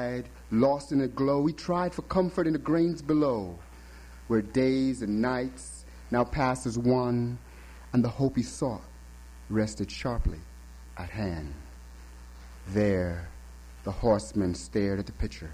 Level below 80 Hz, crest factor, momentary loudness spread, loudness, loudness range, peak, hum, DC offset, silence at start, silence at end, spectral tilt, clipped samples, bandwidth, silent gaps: -44 dBFS; 16 dB; 22 LU; -29 LUFS; 7 LU; -12 dBFS; none; under 0.1%; 0 s; 0 s; -7 dB/octave; under 0.1%; 15 kHz; none